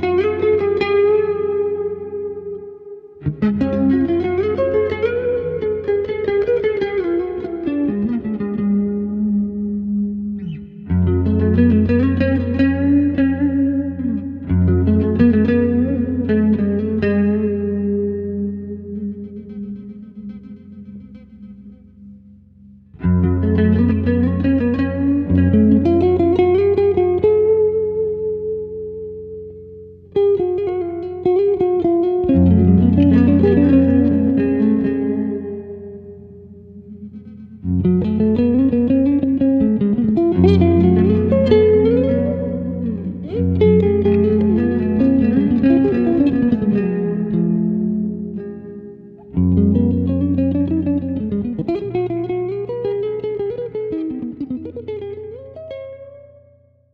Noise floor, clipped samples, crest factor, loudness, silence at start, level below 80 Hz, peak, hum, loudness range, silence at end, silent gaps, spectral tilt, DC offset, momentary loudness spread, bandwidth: -52 dBFS; under 0.1%; 16 dB; -17 LUFS; 0 s; -38 dBFS; 0 dBFS; none; 9 LU; 0.7 s; none; -11 dB/octave; under 0.1%; 17 LU; 5.2 kHz